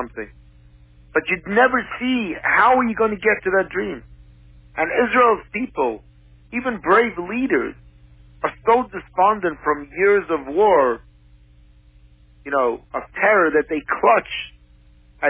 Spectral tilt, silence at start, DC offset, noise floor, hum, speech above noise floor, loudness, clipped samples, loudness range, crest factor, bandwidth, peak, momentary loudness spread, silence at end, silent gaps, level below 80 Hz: -8.5 dB/octave; 0 s; under 0.1%; -50 dBFS; 60 Hz at -50 dBFS; 31 dB; -19 LUFS; under 0.1%; 3 LU; 18 dB; 4 kHz; -4 dBFS; 14 LU; 0 s; none; -50 dBFS